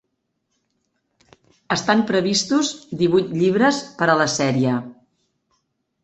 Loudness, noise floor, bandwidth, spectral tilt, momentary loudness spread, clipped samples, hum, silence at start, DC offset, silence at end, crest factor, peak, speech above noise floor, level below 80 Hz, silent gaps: -19 LUFS; -74 dBFS; 8.4 kHz; -4.5 dB/octave; 7 LU; under 0.1%; none; 1.7 s; under 0.1%; 1.1 s; 20 dB; -2 dBFS; 55 dB; -60 dBFS; none